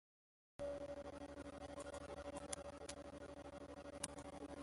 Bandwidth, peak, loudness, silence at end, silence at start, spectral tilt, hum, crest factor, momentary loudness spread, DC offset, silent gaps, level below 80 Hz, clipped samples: 11.5 kHz; -22 dBFS; -52 LUFS; 0 s; 0.6 s; -4 dB/octave; none; 30 dB; 6 LU; under 0.1%; none; -66 dBFS; under 0.1%